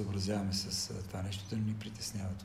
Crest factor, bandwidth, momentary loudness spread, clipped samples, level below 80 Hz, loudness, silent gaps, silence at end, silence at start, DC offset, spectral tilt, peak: 14 dB; 15.5 kHz; 6 LU; under 0.1%; -58 dBFS; -37 LUFS; none; 0 s; 0 s; under 0.1%; -4.5 dB/octave; -24 dBFS